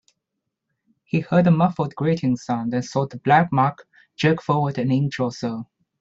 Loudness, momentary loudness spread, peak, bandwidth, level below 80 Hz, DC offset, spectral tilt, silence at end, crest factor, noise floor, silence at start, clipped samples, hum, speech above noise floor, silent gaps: -21 LUFS; 9 LU; -4 dBFS; 7.8 kHz; -60 dBFS; under 0.1%; -7.5 dB/octave; 0.35 s; 18 dB; -80 dBFS; 1.15 s; under 0.1%; none; 60 dB; none